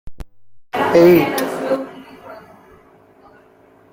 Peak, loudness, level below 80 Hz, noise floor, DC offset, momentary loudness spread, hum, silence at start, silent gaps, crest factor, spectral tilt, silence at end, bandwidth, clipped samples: 0 dBFS; -15 LUFS; -46 dBFS; -50 dBFS; under 0.1%; 28 LU; none; 0.05 s; none; 18 dB; -6 dB/octave; 1.55 s; 16.5 kHz; under 0.1%